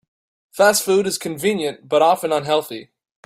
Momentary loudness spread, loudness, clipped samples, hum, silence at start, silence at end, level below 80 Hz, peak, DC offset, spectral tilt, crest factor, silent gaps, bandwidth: 13 LU; -18 LUFS; under 0.1%; none; 0.55 s; 0.4 s; -64 dBFS; -2 dBFS; under 0.1%; -3 dB/octave; 18 dB; none; 16 kHz